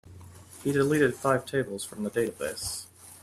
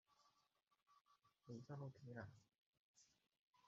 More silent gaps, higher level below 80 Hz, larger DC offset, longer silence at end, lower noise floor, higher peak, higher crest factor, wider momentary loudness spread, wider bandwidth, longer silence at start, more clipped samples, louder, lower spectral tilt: second, none vs 2.66-2.71 s, 2.79-2.94 s, 3.41-3.53 s; first, -60 dBFS vs under -90 dBFS; neither; about the same, 0.05 s vs 0 s; second, -48 dBFS vs -82 dBFS; first, -10 dBFS vs -40 dBFS; about the same, 20 dB vs 22 dB; first, 12 LU vs 5 LU; first, 15 kHz vs 7.4 kHz; about the same, 0.05 s vs 0.1 s; neither; first, -29 LUFS vs -58 LUFS; second, -5 dB/octave vs -7 dB/octave